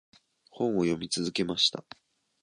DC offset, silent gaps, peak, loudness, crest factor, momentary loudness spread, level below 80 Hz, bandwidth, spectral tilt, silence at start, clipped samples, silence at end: under 0.1%; none; -10 dBFS; -28 LUFS; 22 dB; 7 LU; -64 dBFS; 11 kHz; -4 dB/octave; 0.55 s; under 0.1%; 0.65 s